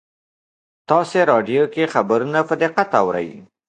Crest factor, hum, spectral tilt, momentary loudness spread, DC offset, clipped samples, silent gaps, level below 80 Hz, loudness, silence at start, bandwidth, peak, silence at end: 20 dB; none; -6 dB/octave; 5 LU; under 0.1%; under 0.1%; none; -64 dBFS; -18 LUFS; 0.9 s; 9.6 kHz; 0 dBFS; 0.25 s